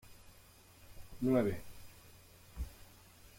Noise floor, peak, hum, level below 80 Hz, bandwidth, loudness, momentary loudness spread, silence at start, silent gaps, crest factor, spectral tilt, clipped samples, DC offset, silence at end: -61 dBFS; -20 dBFS; none; -54 dBFS; 16.5 kHz; -37 LUFS; 27 LU; 0.05 s; none; 22 dB; -7 dB/octave; under 0.1%; under 0.1%; 0.1 s